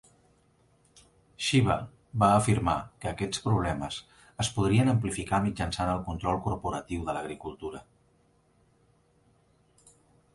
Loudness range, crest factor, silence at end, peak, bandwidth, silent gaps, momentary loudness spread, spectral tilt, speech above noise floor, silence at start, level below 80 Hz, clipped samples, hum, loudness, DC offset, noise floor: 11 LU; 22 dB; 2.55 s; -8 dBFS; 11.5 kHz; none; 15 LU; -5.5 dB/octave; 38 dB; 1.4 s; -48 dBFS; under 0.1%; none; -29 LUFS; under 0.1%; -66 dBFS